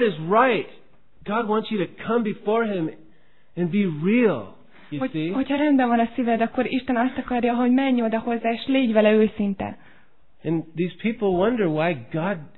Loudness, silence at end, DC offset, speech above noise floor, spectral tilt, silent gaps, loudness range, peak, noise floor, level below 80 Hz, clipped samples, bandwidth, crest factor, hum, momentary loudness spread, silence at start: -23 LUFS; 0.1 s; 0.6%; 37 dB; -10.5 dB/octave; none; 4 LU; -4 dBFS; -59 dBFS; -56 dBFS; under 0.1%; 4.2 kHz; 18 dB; none; 10 LU; 0 s